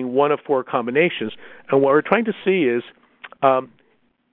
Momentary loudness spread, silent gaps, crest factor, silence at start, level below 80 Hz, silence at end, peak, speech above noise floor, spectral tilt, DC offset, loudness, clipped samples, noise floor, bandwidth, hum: 9 LU; none; 20 dB; 0 s; -66 dBFS; 0.65 s; 0 dBFS; 44 dB; -10 dB/octave; under 0.1%; -19 LUFS; under 0.1%; -63 dBFS; 4.1 kHz; none